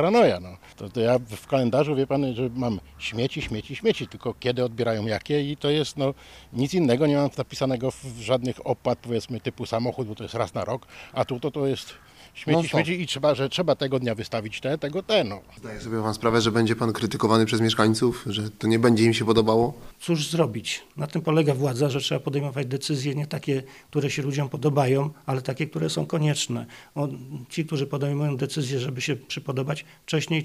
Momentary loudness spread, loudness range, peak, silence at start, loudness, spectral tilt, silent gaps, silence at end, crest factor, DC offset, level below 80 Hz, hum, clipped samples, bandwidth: 11 LU; 6 LU; -4 dBFS; 0 s; -25 LUFS; -5.5 dB/octave; none; 0 s; 22 dB; under 0.1%; -54 dBFS; none; under 0.1%; 15.5 kHz